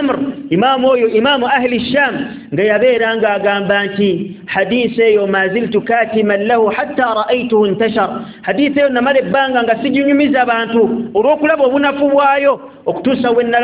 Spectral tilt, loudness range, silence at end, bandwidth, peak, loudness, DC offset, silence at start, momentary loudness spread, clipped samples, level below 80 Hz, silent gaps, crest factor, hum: -9 dB/octave; 1 LU; 0 s; 4 kHz; 0 dBFS; -13 LUFS; under 0.1%; 0 s; 5 LU; under 0.1%; -52 dBFS; none; 12 dB; none